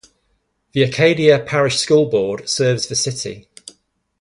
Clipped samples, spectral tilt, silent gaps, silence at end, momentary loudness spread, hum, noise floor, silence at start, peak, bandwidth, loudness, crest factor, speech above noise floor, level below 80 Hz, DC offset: under 0.1%; -4 dB/octave; none; 0.8 s; 12 LU; none; -66 dBFS; 0.75 s; 0 dBFS; 11.5 kHz; -16 LUFS; 18 dB; 50 dB; -54 dBFS; under 0.1%